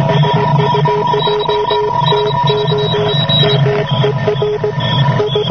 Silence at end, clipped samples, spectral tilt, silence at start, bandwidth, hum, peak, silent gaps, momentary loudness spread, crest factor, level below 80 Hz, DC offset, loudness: 0 s; under 0.1%; -7 dB/octave; 0 s; 6.4 kHz; none; 0 dBFS; none; 4 LU; 12 dB; -40 dBFS; 0.3%; -13 LUFS